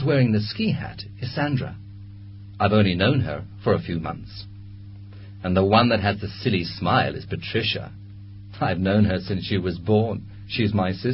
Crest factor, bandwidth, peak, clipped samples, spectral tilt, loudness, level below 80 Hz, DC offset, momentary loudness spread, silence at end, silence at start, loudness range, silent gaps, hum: 20 dB; 5.8 kHz; -2 dBFS; under 0.1%; -11 dB/octave; -23 LUFS; -42 dBFS; under 0.1%; 22 LU; 0 s; 0 s; 2 LU; none; none